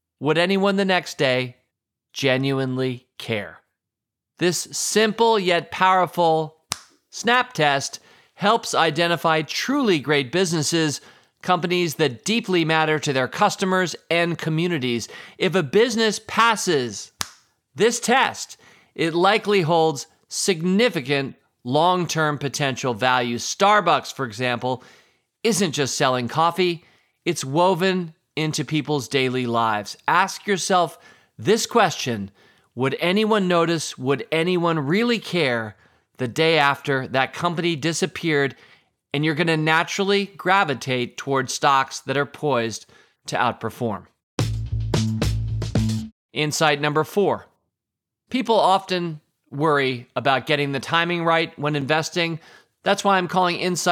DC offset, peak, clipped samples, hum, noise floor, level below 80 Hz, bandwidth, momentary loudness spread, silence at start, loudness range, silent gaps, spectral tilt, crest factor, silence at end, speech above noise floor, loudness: under 0.1%; -2 dBFS; under 0.1%; none; -85 dBFS; -46 dBFS; 17.5 kHz; 10 LU; 0.2 s; 3 LU; 44.23-44.38 s, 46.12-46.29 s; -4 dB/octave; 20 dB; 0 s; 64 dB; -21 LUFS